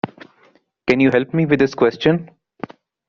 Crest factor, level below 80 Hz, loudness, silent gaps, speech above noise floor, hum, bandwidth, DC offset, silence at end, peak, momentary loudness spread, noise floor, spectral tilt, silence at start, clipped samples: 18 dB; -54 dBFS; -17 LUFS; none; 40 dB; none; 7 kHz; under 0.1%; 0.8 s; -2 dBFS; 20 LU; -56 dBFS; -5.5 dB/octave; 0.05 s; under 0.1%